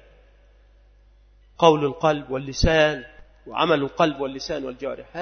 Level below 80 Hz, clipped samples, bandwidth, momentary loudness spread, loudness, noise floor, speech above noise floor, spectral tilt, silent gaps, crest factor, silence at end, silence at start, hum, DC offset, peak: -38 dBFS; under 0.1%; 6.6 kHz; 14 LU; -22 LUFS; -54 dBFS; 32 dB; -5 dB/octave; none; 24 dB; 0 s; 1.6 s; none; under 0.1%; 0 dBFS